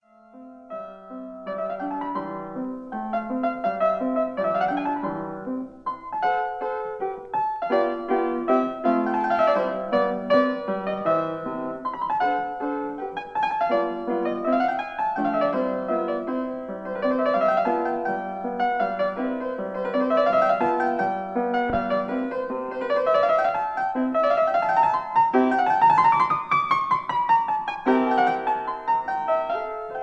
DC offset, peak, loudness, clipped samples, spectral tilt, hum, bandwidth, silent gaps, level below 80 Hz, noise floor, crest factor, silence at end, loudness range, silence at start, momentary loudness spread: under 0.1%; -8 dBFS; -24 LUFS; under 0.1%; -7 dB/octave; none; 7.8 kHz; none; -60 dBFS; -47 dBFS; 16 dB; 0 s; 6 LU; 0.35 s; 11 LU